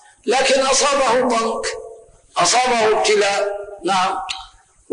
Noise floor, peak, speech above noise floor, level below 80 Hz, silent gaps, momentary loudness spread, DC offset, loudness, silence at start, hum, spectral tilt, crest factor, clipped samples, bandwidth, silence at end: -44 dBFS; -6 dBFS; 27 dB; -50 dBFS; none; 12 LU; under 0.1%; -17 LUFS; 0.25 s; none; -1.5 dB/octave; 12 dB; under 0.1%; 10.5 kHz; 0.45 s